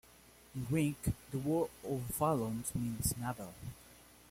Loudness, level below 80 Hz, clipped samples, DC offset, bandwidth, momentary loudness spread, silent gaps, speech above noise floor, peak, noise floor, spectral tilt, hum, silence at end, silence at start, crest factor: -37 LUFS; -56 dBFS; under 0.1%; under 0.1%; 16.5 kHz; 15 LU; none; 25 dB; -20 dBFS; -61 dBFS; -6 dB/octave; none; 0.1 s; 0.25 s; 18 dB